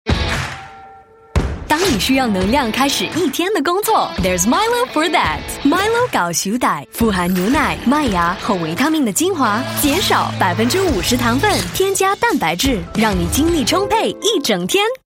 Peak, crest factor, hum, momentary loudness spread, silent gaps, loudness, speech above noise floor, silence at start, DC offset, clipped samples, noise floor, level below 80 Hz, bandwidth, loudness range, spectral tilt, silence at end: 0 dBFS; 16 dB; none; 4 LU; none; -16 LUFS; 26 dB; 0.05 s; under 0.1%; under 0.1%; -42 dBFS; -32 dBFS; 16.5 kHz; 1 LU; -4 dB/octave; 0.1 s